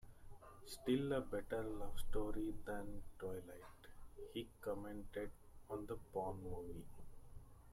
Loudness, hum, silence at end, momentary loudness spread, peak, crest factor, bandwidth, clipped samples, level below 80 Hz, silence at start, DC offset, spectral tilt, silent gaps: -47 LUFS; none; 0 s; 21 LU; -28 dBFS; 18 dB; 15.5 kHz; under 0.1%; -54 dBFS; 0 s; under 0.1%; -6 dB/octave; none